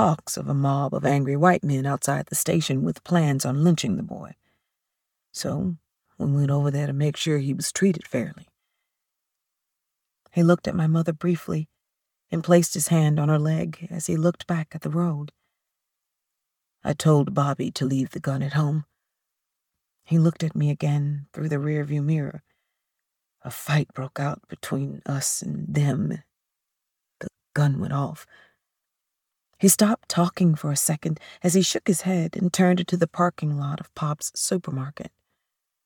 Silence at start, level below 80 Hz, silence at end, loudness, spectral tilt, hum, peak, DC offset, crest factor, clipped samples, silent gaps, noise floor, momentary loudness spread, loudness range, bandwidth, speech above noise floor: 0 s; -62 dBFS; 0.8 s; -24 LUFS; -5.5 dB/octave; none; -4 dBFS; under 0.1%; 20 dB; under 0.1%; none; -83 dBFS; 11 LU; 6 LU; 19 kHz; 60 dB